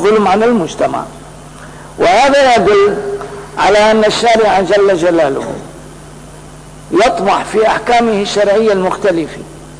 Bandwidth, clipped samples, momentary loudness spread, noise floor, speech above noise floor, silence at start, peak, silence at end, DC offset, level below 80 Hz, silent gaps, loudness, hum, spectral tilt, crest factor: 11 kHz; under 0.1%; 16 LU; -33 dBFS; 23 dB; 0 s; -4 dBFS; 0 s; 0.3%; -40 dBFS; none; -11 LUFS; none; -4.5 dB/octave; 8 dB